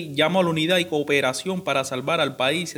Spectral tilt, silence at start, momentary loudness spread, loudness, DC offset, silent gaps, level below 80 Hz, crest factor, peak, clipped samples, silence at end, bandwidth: -4 dB/octave; 0 s; 4 LU; -22 LUFS; under 0.1%; none; -66 dBFS; 18 dB; -6 dBFS; under 0.1%; 0 s; over 20 kHz